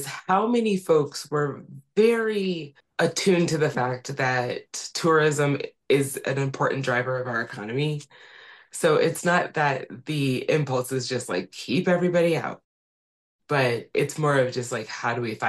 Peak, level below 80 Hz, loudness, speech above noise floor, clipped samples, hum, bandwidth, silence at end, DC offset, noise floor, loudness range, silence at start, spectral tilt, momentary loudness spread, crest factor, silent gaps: -8 dBFS; -68 dBFS; -24 LUFS; over 66 dB; under 0.1%; none; 12.5 kHz; 0 s; under 0.1%; under -90 dBFS; 2 LU; 0 s; -5 dB/octave; 9 LU; 16 dB; 12.64-13.39 s